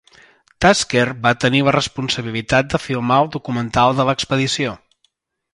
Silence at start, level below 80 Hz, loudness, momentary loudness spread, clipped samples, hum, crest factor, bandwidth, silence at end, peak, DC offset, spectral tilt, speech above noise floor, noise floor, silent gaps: 0.6 s; -44 dBFS; -17 LUFS; 7 LU; under 0.1%; none; 18 dB; 11.5 kHz; 0.75 s; 0 dBFS; under 0.1%; -4.5 dB/octave; 48 dB; -66 dBFS; none